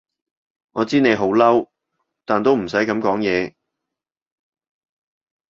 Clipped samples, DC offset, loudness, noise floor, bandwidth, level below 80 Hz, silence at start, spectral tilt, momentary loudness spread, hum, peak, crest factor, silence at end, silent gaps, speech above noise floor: under 0.1%; under 0.1%; -18 LUFS; -85 dBFS; 7.6 kHz; -58 dBFS; 0.75 s; -6 dB/octave; 11 LU; none; -2 dBFS; 18 dB; 2 s; none; 68 dB